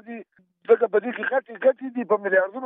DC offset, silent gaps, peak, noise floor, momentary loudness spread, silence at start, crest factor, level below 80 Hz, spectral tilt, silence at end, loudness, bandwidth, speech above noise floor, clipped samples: under 0.1%; none; -6 dBFS; -48 dBFS; 19 LU; 0.05 s; 18 dB; under -90 dBFS; -3.5 dB/octave; 0 s; -23 LUFS; 3.8 kHz; 25 dB; under 0.1%